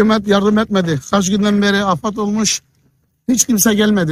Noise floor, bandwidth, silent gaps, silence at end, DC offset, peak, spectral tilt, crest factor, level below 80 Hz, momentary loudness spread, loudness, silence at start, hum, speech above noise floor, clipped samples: -59 dBFS; 16.5 kHz; none; 0 s; under 0.1%; 0 dBFS; -4 dB/octave; 14 dB; -48 dBFS; 6 LU; -15 LUFS; 0 s; none; 45 dB; under 0.1%